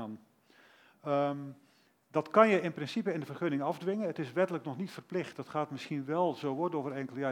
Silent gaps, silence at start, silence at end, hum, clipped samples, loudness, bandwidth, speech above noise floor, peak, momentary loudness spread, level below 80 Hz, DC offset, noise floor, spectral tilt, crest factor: none; 0 s; 0 s; none; under 0.1%; -33 LUFS; 16.5 kHz; 31 dB; -8 dBFS; 13 LU; -88 dBFS; under 0.1%; -63 dBFS; -7 dB/octave; 26 dB